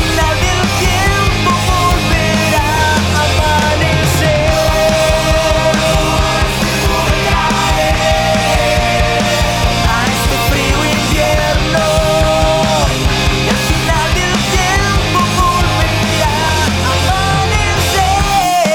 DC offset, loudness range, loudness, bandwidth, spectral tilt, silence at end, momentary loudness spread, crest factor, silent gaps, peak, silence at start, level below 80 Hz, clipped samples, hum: under 0.1%; 1 LU; -12 LUFS; over 20 kHz; -4 dB/octave; 0 s; 1 LU; 12 dB; none; 0 dBFS; 0 s; -20 dBFS; under 0.1%; none